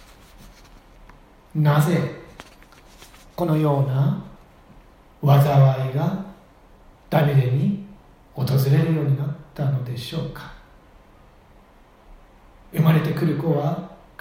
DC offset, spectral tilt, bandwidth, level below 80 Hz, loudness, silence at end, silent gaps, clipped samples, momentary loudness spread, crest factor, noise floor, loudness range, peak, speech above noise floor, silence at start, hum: under 0.1%; -8 dB/octave; 16.5 kHz; -52 dBFS; -21 LUFS; 0.25 s; none; under 0.1%; 22 LU; 18 dB; -51 dBFS; 6 LU; -4 dBFS; 32 dB; 0.45 s; none